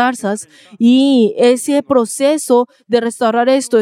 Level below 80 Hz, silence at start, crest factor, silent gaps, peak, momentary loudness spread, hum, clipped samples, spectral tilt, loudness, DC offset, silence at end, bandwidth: -66 dBFS; 0 s; 12 dB; none; 0 dBFS; 6 LU; none; under 0.1%; -4 dB/octave; -13 LUFS; under 0.1%; 0 s; 15.5 kHz